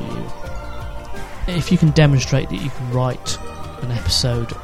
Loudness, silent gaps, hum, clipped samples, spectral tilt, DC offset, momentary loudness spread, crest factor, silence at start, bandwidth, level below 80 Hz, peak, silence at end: -19 LUFS; none; none; under 0.1%; -5.5 dB/octave; under 0.1%; 18 LU; 20 dB; 0 s; 14.5 kHz; -32 dBFS; 0 dBFS; 0 s